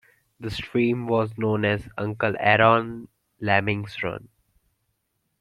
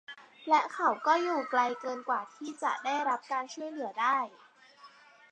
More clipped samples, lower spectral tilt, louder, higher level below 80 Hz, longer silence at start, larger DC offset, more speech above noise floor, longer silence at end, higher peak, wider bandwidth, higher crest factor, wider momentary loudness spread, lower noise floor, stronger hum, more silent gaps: neither; first, -7.5 dB/octave vs -2.5 dB/octave; first, -23 LUFS vs -31 LUFS; first, -56 dBFS vs under -90 dBFS; first, 0.4 s vs 0.1 s; neither; first, 52 dB vs 26 dB; first, 1.15 s vs 0.45 s; first, -2 dBFS vs -12 dBFS; first, 12 kHz vs 9.4 kHz; about the same, 22 dB vs 20 dB; first, 16 LU vs 12 LU; first, -75 dBFS vs -57 dBFS; neither; neither